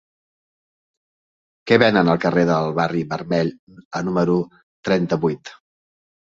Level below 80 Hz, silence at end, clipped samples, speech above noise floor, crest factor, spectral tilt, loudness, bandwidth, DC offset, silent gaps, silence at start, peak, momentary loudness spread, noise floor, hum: -56 dBFS; 0.8 s; under 0.1%; over 71 dB; 20 dB; -7 dB/octave; -19 LUFS; 7.6 kHz; under 0.1%; 3.59-3.67 s, 3.85-3.91 s, 4.63-4.83 s; 1.65 s; -2 dBFS; 15 LU; under -90 dBFS; none